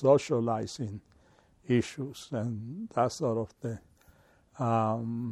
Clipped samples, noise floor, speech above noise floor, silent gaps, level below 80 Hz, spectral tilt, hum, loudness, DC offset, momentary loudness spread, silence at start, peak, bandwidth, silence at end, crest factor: under 0.1%; -63 dBFS; 33 dB; none; -66 dBFS; -7 dB/octave; none; -31 LUFS; under 0.1%; 12 LU; 0 s; -10 dBFS; 13 kHz; 0 s; 22 dB